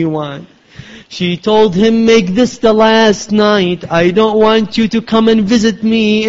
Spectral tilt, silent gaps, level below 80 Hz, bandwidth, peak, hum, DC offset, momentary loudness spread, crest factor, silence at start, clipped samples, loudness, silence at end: -5.5 dB/octave; none; -44 dBFS; 7.8 kHz; 0 dBFS; none; under 0.1%; 9 LU; 10 dB; 0 s; under 0.1%; -11 LUFS; 0 s